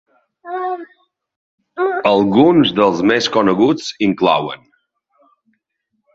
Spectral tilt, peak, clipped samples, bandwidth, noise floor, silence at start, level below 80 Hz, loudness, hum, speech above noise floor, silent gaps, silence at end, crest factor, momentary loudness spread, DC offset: -5.5 dB/octave; 0 dBFS; under 0.1%; 7.8 kHz; -72 dBFS; 0.45 s; -54 dBFS; -15 LUFS; none; 57 dB; 1.36-1.58 s; 1.6 s; 16 dB; 16 LU; under 0.1%